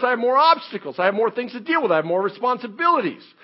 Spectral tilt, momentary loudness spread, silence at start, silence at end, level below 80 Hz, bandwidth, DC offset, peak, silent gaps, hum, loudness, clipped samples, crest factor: -9 dB/octave; 8 LU; 0 s; 0.25 s; -84 dBFS; 5.8 kHz; under 0.1%; -2 dBFS; none; none; -20 LUFS; under 0.1%; 18 dB